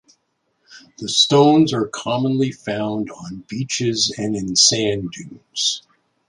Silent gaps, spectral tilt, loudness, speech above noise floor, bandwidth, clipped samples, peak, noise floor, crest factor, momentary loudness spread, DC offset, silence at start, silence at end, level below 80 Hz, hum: none; -3.5 dB/octave; -18 LUFS; 50 dB; 11.5 kHz; under 0.1%; -2 dBFS; -69 dBFS; 18 dB; 17 LU; under 0.1%; 0.7 s; 0.5 s; -56 dBFS; none